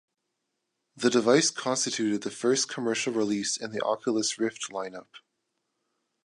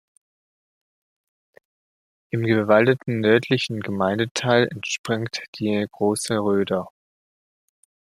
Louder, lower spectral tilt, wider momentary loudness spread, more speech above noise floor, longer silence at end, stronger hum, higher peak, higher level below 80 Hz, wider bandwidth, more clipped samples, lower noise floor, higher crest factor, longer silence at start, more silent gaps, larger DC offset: second, -27 LUFS vs -22 LUFS; second, -3 dB/octave vs -5 dB/octave; about the same, 11 LU vs 10 LU; second, 54 dB vs over 69 dB; second, 1.1 s vs 1.25 s; neither; second, -8 dBFS vs -2 dBFS; second, -78 dBFS vs -64 dBFS; second, 11.5 kHz vs 14.5 kHz; neither; second, -81 dBFS vs under -90 dBFS; about the same, 22 dB vs 22 dB; second, 0.95 s vs 2.35 s; second, none vs 4.31-4.35 s, 4.99-5.04 s, 5.48-5.53 s; neither